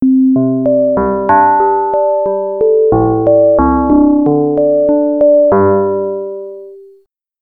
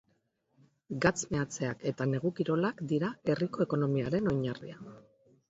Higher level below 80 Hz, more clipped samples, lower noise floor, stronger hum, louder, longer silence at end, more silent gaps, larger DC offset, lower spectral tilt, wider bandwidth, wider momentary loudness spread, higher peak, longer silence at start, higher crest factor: first, -34 dBFS vs -62 dBFS; neither; second, -49 dBFS vs -75 dBFS; neither; first, -11 LUFS vs -32 LUFS; about the same, 0.6 s vs 0.5 s; neither; first, 0.4% vs under 0.1%; first, -12.5 dB/octave vs -6 dB/octave; second, 2.6 kHz vs 8 kHz; second, 8 LU vs 12 LU; first, 0 dBFS vs -12 dBFS; second, 0 s vs 0.9 s; second, 10 dB vs 20 dB